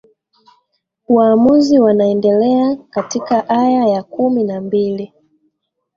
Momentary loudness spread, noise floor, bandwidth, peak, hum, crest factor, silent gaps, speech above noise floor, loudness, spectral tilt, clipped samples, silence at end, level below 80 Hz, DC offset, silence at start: 10 LU; -68 dBFS; 7.4 kHz; -2 dBFS; none; 14 dB; none; 55 dB; -14 LUFS; -6.5 dB/octave; under 0.1%; 0.9 s; -58 dBFS; under 0.1%; 1.1 s